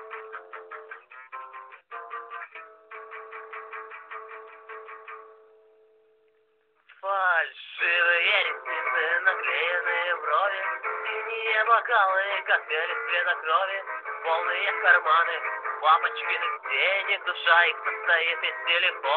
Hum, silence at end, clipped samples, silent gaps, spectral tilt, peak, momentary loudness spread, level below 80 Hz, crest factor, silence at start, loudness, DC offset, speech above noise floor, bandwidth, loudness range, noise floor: none; 0 s; under 0.1%; none; -1 dB/octave; -6 dBFS; 21 LU; under -90 dBFS; 20 dB; 0 s; -24 LUFS; under 0.1%; 42 dB; 5.6 kHz; 18 LU; -67 dBFS